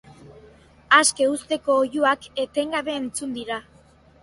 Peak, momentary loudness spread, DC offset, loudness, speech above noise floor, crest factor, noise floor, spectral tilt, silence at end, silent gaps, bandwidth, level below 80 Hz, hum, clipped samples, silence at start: -2 dBFS; 13 LU; under 0.1%; -22 LUFS; 31 dB; 22 dB; -53 dBFS; -1.5 dB/octave; 0.6 s; none; 11.5 kHz; -60 dBFS; none; under 0.1%; 0.25 s